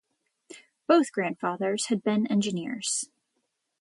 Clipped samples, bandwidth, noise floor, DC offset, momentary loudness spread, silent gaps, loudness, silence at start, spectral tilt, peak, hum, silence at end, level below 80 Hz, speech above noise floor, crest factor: under 0.1%; 11.5 kHz; -78 dBFS; under 0.1%; 8 LU; none; -27 LUFS; 0.5 s; -4 dB/octave; -8 dBFS; none; 0.75 s; -76 dBFS; 52 dB; 20 dB